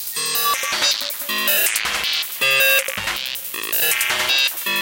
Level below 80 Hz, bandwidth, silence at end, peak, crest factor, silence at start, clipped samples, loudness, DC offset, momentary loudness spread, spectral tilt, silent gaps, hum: -56 dBFS; 18 kHz; 0 s; -2 dBFS; 18 dB; 0 s; under 0.1%; -17 LUFS; under 0.1%; 8 LU; 1 dB/octave; none; none